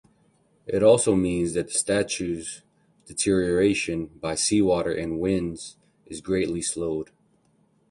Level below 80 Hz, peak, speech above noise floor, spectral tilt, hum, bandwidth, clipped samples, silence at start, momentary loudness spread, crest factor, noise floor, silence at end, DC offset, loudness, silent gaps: -50 dBFS; -6 dBFS; 40 dB; -4.5 dB/octave; none; 11.5 kHz; under 0.1%; 0.65 s; 18 LU; 20 dB; -64 dBFS; 0.85 s; under 0.1%; -24 LUFS; none